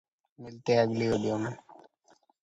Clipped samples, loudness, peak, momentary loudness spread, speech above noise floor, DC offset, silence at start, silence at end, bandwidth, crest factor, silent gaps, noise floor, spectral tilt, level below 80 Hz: under 0.1%; -29 LUFS; -12 dBFS; 22 LU; 38 dB; under 0.1%; 0.4 s; 0.85 s; 8.2 kHz; 20 dB; none; -66 dBFS; -6.5 dB/octave; -64 dBFS